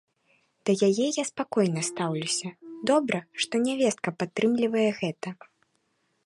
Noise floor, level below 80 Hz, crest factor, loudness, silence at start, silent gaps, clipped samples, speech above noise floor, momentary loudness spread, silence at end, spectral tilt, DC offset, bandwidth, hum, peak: -73 dBFS; -76 dBFS; 16 dB; -27 LUFS; 0.65 s; none; under 0.1%; 46 dB; 8 LU; 0.9 s; -4.5 dB/octave; under 0.1%; 11.5 kHz; none; -10 dBFS